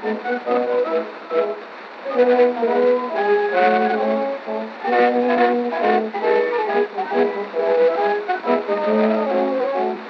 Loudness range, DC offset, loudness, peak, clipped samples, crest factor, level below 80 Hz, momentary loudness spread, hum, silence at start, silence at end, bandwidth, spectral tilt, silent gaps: 1 LU; under 0.1%; -19 LUFS; -4 dBFS; under 0.1%; 16 dB; -80 dBFS; 8 LU; none; 0 s; 0 s; 6 kHz; -7 dB/octave; none